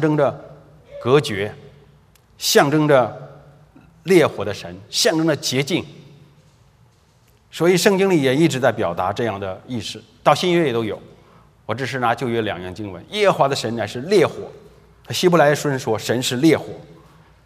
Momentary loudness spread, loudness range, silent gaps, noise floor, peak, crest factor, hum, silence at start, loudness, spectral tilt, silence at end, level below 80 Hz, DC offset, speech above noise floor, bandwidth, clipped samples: 16 LU; 3 LU; none; -55 dBFS; 0 dBFS; 20 dB; none; 0 s; -19 LUFS; -4.5 dB/octave; 0.5 s; -58 dBFS; under 0.1%; 37 dB; 16 kHz; under 0.1%